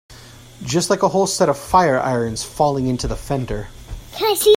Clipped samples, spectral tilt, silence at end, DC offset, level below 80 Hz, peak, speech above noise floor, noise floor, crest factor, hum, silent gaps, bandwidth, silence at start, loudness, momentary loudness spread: under 0.1%; -4.5 dB/octave; 0 s; under 0.1%; -36 dBFS; 0 dBFS; 23 dB; -41 dBFS; 18 dB; none; none; 16.5 kHz; 0.1 s; -19 LUFS; 15 LU